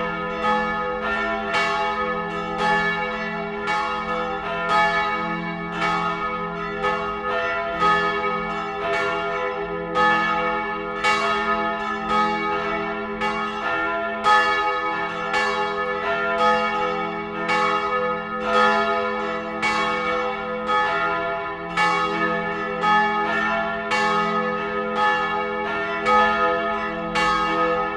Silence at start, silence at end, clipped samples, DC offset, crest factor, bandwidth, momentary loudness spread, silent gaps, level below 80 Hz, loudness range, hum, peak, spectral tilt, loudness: 0 s; 0 s; under 0.1%; under 0.1%; 18 dB; 11.5 kHz; 7 LU; none; -50 dBFS; 2 LU; none; -4 dBFS; -4.5 dB/octave; -22 LUFS